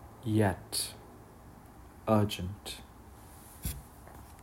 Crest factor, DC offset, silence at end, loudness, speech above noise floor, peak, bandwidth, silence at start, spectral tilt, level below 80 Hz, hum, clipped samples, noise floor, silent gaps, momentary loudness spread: 22 dB; under 0.1%; 0 s; -33 LUFS; 22 dB; -12 dBFS; 16 kHz; 0 s; -5 dB/octave; -52 dBFS; none; under 0.1%; -53 dBFS; none; 24 LU